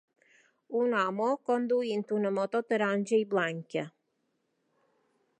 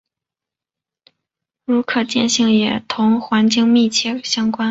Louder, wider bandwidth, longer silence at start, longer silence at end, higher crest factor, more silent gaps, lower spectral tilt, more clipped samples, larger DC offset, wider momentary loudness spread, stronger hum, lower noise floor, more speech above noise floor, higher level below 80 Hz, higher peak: second, -30 LUFS vs -16 LUFS; first, 9.6 kHz vs 8 kHz; second, 0.7 s vs 1.7 s; first, 1.5 s vs 0 s; about the same, 18 dB vs 16 dB; neither; first, -6 dB/octave vs -3.5 dB/octave; neither; neither; about the same, 8 LU vs 6 LU; neither; second, -78 dBFS vs -87 dBFS; second, 49 dB vs 71 dB; second, -86 dBFS vs -60 dBFS; second, -14 dBFS vs -2 dBFS